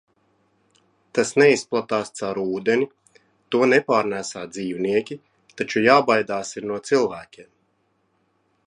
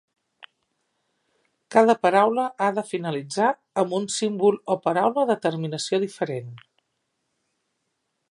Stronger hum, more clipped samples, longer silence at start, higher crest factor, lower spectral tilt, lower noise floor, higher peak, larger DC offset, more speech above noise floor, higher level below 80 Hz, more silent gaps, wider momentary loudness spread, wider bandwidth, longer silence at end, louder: neither; neither; second, 1.15 s vs 1.7 s; about the same, 22 dB vs 22 dB; about the same, -4.5 dB/octave vs -5 dB/octave; second, -68 dBFS vs -77 dBFS; about the same, -2 dBFS vs -2 dBFS; neither; second, 47 dB vs 54 dB; first, -66 dBFS vs -76 dBFS; neither; first, 14 LU vs 10 LU; about the same, 11 kHz vs 11.5 kHz; second, 1.25 s vs 1.7 s; about the same, -21 LUFS vs -23 LUFS